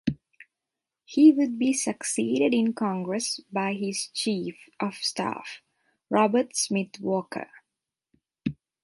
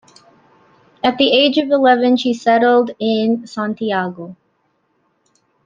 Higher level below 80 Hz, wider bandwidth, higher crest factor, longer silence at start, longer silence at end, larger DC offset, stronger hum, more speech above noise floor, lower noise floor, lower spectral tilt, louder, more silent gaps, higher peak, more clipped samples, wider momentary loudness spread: about the same, -64 dBFS vs -64 dBFS; first, 11.5 kHz vs 7.6 kHz; about the same, 20 dB vs 16 dB; second, 0.05 s vs 1.05 s; second, 0.3 s vs 1.3 s; neither; neither; first, 62 dB vs 49 dB; first, -88 dBFS vs -64 dBFS; about the same, -4 dB/octave vs -5 dB/octave; second, -26 LUFS vs -15 LUFS; neither; second, -8 dBFS vs 0 dBFS; neither; first, 16 LU vs 10 LU